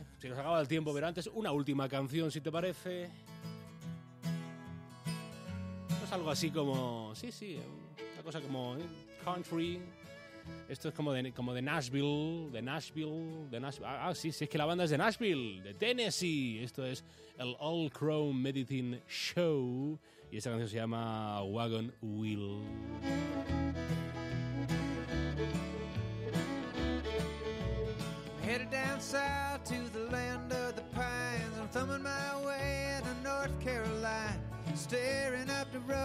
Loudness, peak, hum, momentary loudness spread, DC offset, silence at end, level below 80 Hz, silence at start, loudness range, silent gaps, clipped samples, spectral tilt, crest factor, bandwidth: -38 LUFS; -18 dBFS; none; 11 LU; under 0.1%; 0 s; -54 dBFS; 0 s; 5 LU; none; under 0.1%; -5.5 dB/octave; 20 dB; 15.5 kHz